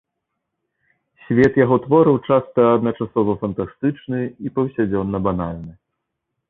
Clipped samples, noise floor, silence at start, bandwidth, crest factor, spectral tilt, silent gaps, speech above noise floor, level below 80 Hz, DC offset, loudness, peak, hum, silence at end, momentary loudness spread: under 0.1%; -78 dBFS; 1.3 s; 7 kHz; 18 dB; -9.5 dB/octave; none; 60 dB; -48 dBFS; under 0.1%; -19 LUFS; -2 dBFS; none; 0.75 s; 11 LU